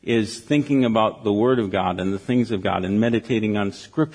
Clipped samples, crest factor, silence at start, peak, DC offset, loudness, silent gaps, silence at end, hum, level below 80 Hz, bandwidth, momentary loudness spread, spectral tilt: under 0.1%; 16 dB; 0.05 s; -6 dBFS; under 0.1%; -21 LUFS; none; 0 s; none; -56 dBFS; 10.5 kHz; 5 LU; -6.5 dB/octave